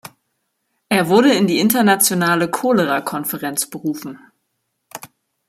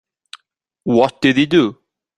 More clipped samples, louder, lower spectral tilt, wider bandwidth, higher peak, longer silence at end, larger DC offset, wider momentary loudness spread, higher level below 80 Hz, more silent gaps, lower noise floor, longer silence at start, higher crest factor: neither; about the same, -16 LUFS vs -15 LUFS; second, -4 dB/octave vs -6 dB/octave; first, 16 kHz vs 11 kHz; about the same, 0 dBFS vs -2 dBFS; about the same, 0.4 s vs 0.45 s; neither; first, 22 LU vs 8 LU; second, -64 dBFS vs -54 dBFS; neither; about the same, -72 dBFS vs -70 dBFS; about the same, 0.9 s vs 0.85 s; about the same, 18 dB vs 16 dB